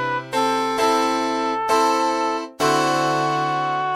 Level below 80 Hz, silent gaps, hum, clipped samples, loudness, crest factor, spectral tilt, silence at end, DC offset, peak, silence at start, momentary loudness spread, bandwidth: -64 dBFS; none; none; under 0.1%; -20 LUFS; 14 dB; -3.5 dB/octave; 0 s; under 0.1%; -6 dBFS; 0 s; 4 LU; 16.5 kHz